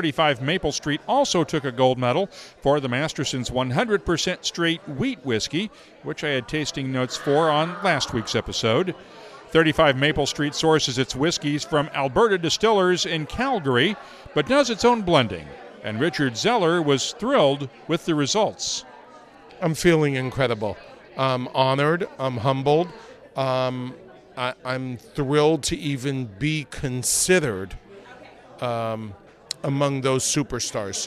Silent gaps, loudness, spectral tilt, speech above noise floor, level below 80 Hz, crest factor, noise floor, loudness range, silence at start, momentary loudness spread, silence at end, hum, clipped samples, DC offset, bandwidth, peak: none; -22 LUFS; -4 dB/octave; 24 dB; -50 dBFS; 20 dB; -47 dBFS; 4 LU; 0 s; 11 LU; 0 s; none; under 0.1%; under 0.1%; 13.5 kHz; -4 dBFS